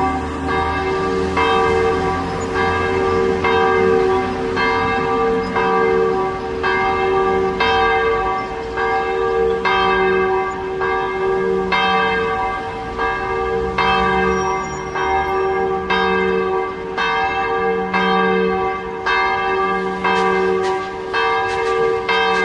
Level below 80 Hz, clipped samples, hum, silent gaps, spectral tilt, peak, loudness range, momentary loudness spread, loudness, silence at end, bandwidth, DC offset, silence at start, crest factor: -38 dBFS; under 0.1%; none; none; -5.5 dB/octave; -2 dBFS; 2 LU; 6 LU; -18 LUFS; 0 s; 10.5 kHz; under 0.1%; 0 s; 14 dB